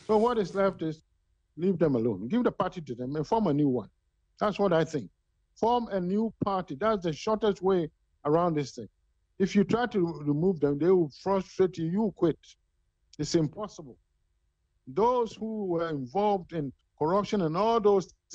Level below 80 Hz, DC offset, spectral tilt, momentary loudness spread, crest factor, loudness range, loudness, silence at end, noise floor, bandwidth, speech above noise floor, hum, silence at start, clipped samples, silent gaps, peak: -60 dBFS; under 0.1%; -7 dB/octave; 11 LU; 16 dB; 4 LU; -28 LUFS; 0 s; -74 dBFS; 8.2 kHz; 47 dB; none; 0.1 s; under 0.1%; none; -12 dBFS